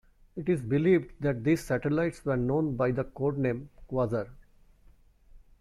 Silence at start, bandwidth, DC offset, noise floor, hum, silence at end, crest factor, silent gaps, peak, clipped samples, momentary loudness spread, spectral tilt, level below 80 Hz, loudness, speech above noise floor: 0.35 s; 14 kHz; under 0.1%; -58 dBFS; none; 0.25 s; 16 dB; none; -12 dBFS; under 0.1%; 10 LU; -8 dB/octave; -52 dBFS; -29 LUFS; 30 dB